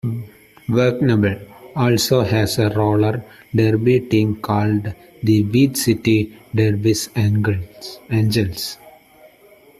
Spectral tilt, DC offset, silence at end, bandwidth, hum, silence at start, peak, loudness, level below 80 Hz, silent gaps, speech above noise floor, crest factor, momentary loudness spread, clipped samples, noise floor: -6 dB/octave; under 0.1%; 0.9 s; 14 kHz; none; 0.05 s; -2 dBFS; -18 LUFS; -48 dBFS; none; 31 dB; 16 dB; 12 LU; under 0.1%; -49 dBFS